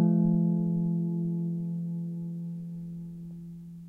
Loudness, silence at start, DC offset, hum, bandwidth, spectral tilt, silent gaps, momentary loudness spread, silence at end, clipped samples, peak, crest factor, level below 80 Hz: -30 LUFS; 0 s; under 0.1%; none; 0.9 kHz; -12.5 dB/octave; none; 17 LU; 0 s; under 0.1%; -14 dBFS; 14 dB; -62 dBFS